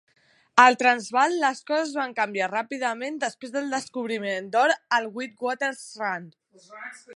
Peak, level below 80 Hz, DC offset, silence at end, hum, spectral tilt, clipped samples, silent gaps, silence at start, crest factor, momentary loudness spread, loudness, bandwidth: 0 dBFS; -82 dBFS; under 0.1%; 0 s; none; -2.5 dB/octave; under 0.1%; none; 0.55 s; 24 dB; 14 LU; -24 LUFS; 11.5 kHz